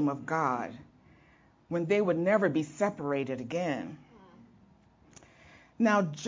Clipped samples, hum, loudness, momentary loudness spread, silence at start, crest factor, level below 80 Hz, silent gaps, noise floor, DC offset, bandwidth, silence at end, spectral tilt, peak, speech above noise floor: under 0.1%; none; -30 LUFS; 12 LU; 0 s; 18 dB; -70 dBFS; none; -62 dBFS; under 0.1%; 7.6 kHz; 0 s; -6.5 dB/octave; -14 dBFS; 32 dB